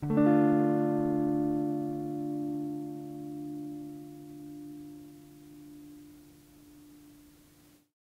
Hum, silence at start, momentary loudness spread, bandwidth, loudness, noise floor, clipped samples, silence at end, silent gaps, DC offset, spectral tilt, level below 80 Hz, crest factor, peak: none; 0 s; 25 LU; 15.5 kHz; -30 LUFS; -61 dBFS; under 0.1%; 0.9 s; none; under 0.1%; -9 dB/octave; -66 dBFS; 18 dB; -14 dBFS